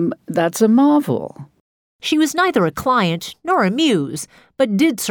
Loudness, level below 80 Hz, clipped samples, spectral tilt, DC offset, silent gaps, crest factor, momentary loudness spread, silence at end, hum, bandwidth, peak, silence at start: -17 LUFS; -56 dBFS; under 0.1%; -5 dB/octave; under 0.1%; 1.60-1.99 s; 14 dB; 12 LU; 0 s; none; 19.5 kHz; -4 dBFS; 0 s